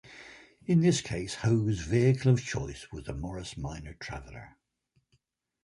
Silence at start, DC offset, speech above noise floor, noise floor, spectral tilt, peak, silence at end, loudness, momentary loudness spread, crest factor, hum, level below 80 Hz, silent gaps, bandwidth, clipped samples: 0.05 s; under 0.1%; 46 dB; -75 dBFS; -6 dB/octave; -12 dBFS; 1.15 s; -29 LUFS; 22 LU; 18 dB; none; -50 dBFS; none; 11.5 kHz; under 0.1%